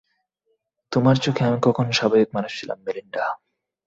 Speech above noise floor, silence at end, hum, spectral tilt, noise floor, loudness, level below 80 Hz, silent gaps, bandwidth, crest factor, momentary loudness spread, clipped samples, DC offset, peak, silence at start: 51 dB; 0.5 s; none; -6 dB/octave; -72 dBFS; -22 LUFS; -58 dBFS; none; 7.8 kHz; 18 dB; 11 LU; under 0.1%; under 0.1%; -4 dBFS; 0.9 s